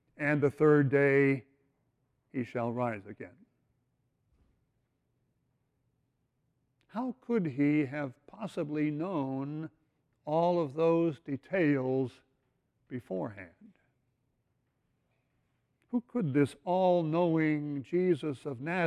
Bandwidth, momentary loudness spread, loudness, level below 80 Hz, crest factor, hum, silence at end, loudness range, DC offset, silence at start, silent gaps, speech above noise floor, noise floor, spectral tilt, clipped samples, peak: 10.5 kHz; 16 LU; -31 LUFS; -74 dBFS; 18 dB; none; 0 s; 13 LU; under 0.1%; 0.2 s; none; 48 dB; -78 dBFS; -8.5 dB/octave; under 0.1%; -14 dBFS